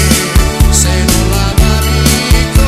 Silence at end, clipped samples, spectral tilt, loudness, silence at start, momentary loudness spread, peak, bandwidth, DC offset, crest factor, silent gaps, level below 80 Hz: 0 s; 0.9%; -4 dB/octave; -10 LUFS; 0 s; 2 LU; 0 dBFS; 14.5 kHz; under 0.1%; 8 dB; none; -12 dBFS